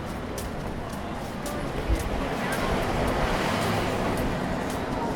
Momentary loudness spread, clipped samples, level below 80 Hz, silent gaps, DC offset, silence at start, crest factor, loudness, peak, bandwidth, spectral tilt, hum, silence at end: 8 LU; under 0.1%; -36 dBFS; none; under 0.1%; 0 s; 14 dB; -28 LUFS; -12 dBFS; 19 kHz; -5.5 dB/octave; none; 0 s